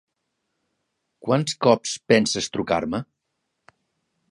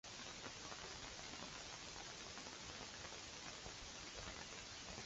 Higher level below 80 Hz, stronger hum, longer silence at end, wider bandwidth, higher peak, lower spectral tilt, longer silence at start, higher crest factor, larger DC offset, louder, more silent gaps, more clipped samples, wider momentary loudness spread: first, -58 dBFS vs -66 dBFS; neither; first, 1.3 s vs 0 s; first, 11.5 kHz vs 8 kHz; first, -2 dBFS vs -34 dBFS; first, -4.5 dB/octave vs -1.5 dB/octave; first, 1.25 s vs 0.05 s; about the same, 22 dB vs 20 dB; neither; first, -22 LUFS vs -51 LUFS; neither; neither; first, 10 LU vs 1 LU